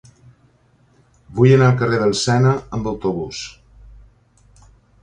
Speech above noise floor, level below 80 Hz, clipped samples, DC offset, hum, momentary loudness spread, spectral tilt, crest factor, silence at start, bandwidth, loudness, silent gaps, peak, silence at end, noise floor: 40 dB; -46 dBFS; under 0.1%; under 0.1%; none; 17 LU; -6 dB/octave; 20 dB; 1.3 s; 9.8 kHz; -17 LUFS; none; 0 dBFS; 1.55 s; -56 dBFS